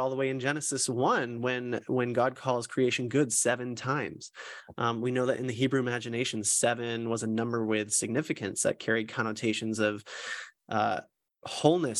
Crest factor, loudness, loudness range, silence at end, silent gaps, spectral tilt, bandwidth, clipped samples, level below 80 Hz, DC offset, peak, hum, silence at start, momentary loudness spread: 20 dB; -29 LUFS; 2 LU; 0 s; none; -4 dB/octave; 13 kHz; under 0.1%; -74 dBFS; under 0.1%; -10 dBFS; none; 0 s; 11 LU